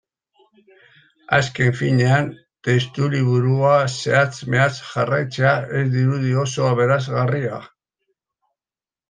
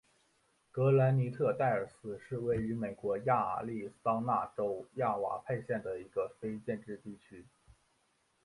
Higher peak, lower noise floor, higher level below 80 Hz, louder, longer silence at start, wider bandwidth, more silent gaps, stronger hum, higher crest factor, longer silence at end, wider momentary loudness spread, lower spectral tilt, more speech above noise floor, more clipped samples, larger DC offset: first, -2 dBFS vs -16 dBFS; first, under -90 dBFS vs -75 dBFS; first, -58 dBFS vs -66 dBFS; first, -19 LUFS vs -34 LUFS; first, 1.3 s vs 0.75 s; second, 9.4 kHz vs 11 kHz; neither; neither; about the same, 18 dB vs 20 dB; first, 1.45 s vs 1 s; second, 5 LU vs 12 LU; second, -6 dB/octave vs -9.5 dB/octave; first, over 71 dB vs 41 dB; neither; neither